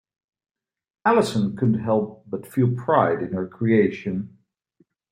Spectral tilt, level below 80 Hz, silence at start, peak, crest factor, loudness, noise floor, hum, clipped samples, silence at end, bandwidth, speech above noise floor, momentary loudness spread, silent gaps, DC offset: -7.5 dB/octave; -62 dBFS; 1.05 s; -4 dBFS; 20 dB; -22 LUFS; -64 dBFS; none; under 0.1%; 0.8 s; 15.5 kHz; 43 dB; 11 LU; none; under 0.1%